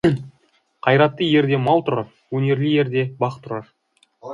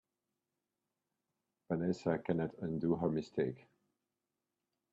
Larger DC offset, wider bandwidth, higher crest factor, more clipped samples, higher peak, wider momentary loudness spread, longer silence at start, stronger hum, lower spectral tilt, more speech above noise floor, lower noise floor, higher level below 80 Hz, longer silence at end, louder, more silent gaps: neither; first, 10.5 kHz vs 7.8 kHz; about the same, 18 dB vs 20 dB; neither; first, -2 dBFS vs -20 dBFS; first, 14 LU vs 5 LU; second, 0.05 s vs 1.7 s; neither; about the same, -8 dB/octave vs -8.5 dB/octave; second, 43 dB vs 53 dB; second, -62 dBFS vs -90 dBFS; first, -56 dBFS vs -70 dBFS; second, 0 s vs 1.35 s; first, -19 LUFS vs -37 LUFS; neither